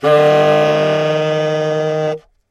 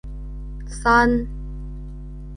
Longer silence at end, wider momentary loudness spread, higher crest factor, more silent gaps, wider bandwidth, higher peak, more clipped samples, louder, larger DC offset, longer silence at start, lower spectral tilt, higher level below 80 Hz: first, 0.3 s vs 0 s; second, 9 LU vs 20 LU; second, 14 dB vs 20 dB; neither; first, 12 kHz vs 10.5 kHz; first, 0 dBFS vs -4 dBFS; neither; first, -14 LUFS vs -19 LUFS; neither; about the same, 0 s vs 0.05 s; about the same, -6 dB/octave vs -6 dB/octave; second, -60 dBFS vs -32 dBFS